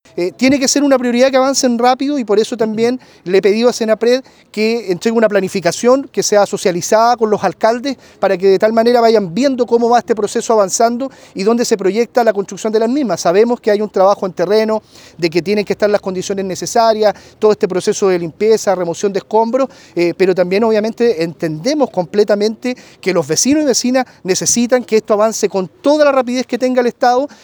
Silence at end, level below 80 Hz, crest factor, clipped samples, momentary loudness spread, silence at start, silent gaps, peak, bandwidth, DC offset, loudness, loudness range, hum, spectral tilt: 0.15 s; -58 dBFS; 14 dB; under 0.1%; 7 LU; 0.15 s; none; 0 dBFS; over 20 kHz; under 0.1%; -14 LUFS; 2 LU; none; -4 dB/octave